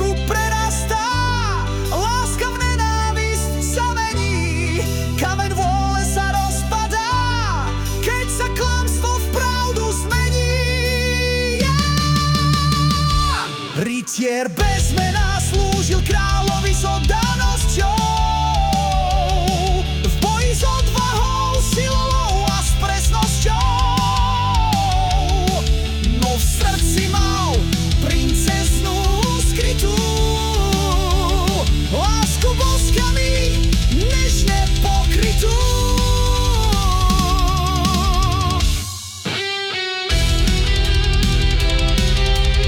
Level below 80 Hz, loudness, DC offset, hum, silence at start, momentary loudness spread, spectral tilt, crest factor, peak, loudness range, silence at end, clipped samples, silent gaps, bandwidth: -20 dBFS; -18 LUFS; under 0.1%; none; 0 s; 3 LU; -4 dB/octave; 12 dB; -6 dBFS; 2 LU; 0 s; under 0.1%; none; 18 kHz